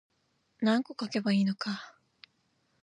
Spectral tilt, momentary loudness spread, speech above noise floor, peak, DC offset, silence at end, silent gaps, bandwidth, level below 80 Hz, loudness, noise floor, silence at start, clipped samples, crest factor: -6 dB/octave; 10 LU; 45 dB; -16 dBFS; under 0.1%; 0.95 s; none; 10 kHz; -82 dBFS; -31 LUFS; -75 dBFS; 0.6 s; under 0.1%; 16 dB